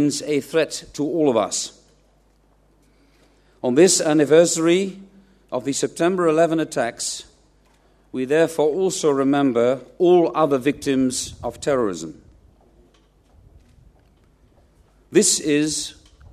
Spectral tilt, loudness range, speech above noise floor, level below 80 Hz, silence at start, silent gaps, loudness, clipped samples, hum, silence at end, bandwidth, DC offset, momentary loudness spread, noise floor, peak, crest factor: -4 dB/octave; 7 LU; 39 dB; -56 dBFS; 0 s; none; -19 LUFS; under 0.1%; none; 0.4 s; 14 kHz; under 0.1%; 13 LU; -58 dBFS; -2 dBFS; 20 dB